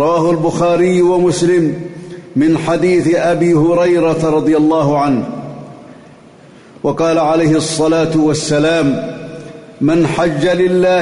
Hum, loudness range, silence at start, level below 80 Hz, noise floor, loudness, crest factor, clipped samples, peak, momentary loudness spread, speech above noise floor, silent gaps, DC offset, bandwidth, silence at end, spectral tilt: none; 3 LU; 0 s; -46 dBFS; -40 dBFS; -13 LUFS; 10 dB; under 0.1%; -4 dBFS; 14 LU; 28 dB; none; under 0.1%; 11 kHz; 0 s; -6 dB/octave